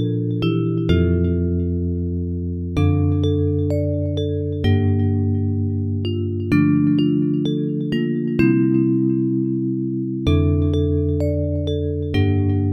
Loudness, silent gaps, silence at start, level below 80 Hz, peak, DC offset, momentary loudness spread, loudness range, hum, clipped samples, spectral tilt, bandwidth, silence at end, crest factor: -20 LUFS; none; 0 s; -36 dBFS; -4 dBFS; under 0.1%; 6 LU; 2 LU; none; under 0.1%; -9.5 dB/octave; 6.2 kHz; 0 s; 16 dB